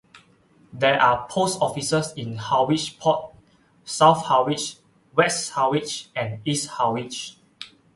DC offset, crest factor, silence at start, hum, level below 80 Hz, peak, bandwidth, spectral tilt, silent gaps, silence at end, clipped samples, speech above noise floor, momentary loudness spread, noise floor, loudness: under 0.1%; 22 dB; 0.15 s; none; -60 dBFS; -2 dBFS; 12 kHz; -4 dB/octave; none; 0.3 s; under 0.1%; 35 dB; 14 LU; -57 dBFS; -22 LUFS